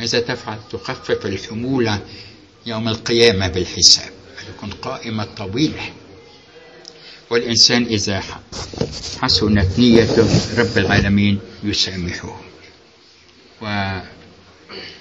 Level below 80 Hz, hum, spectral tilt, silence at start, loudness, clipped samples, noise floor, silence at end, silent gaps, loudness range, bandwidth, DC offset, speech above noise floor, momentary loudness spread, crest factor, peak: -40 dBFS; none; -4 dB/octave; 0 s; -17 LUFS; under 0.1%; -48 dBFS; 0 s; none; 9 LU; 11 kHz; under 0.1%; 31 dB; 21 LU; 20 dB; 0 dBFS